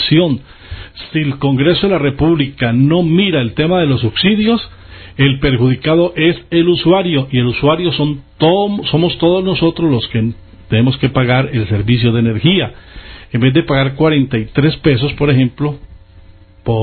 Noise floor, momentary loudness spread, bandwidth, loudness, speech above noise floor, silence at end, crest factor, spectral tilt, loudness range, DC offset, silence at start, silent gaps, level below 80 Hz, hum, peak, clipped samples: -40 dBFS; 9 LU; 4.5 kHz; -13 LUFS; 28 dB; 0 s; 14 dB; -12.5 dB/octave; 1 LU; under 0.1%; 0 s; none; -36 dBFS; none; 0 dBFS; under 0.1%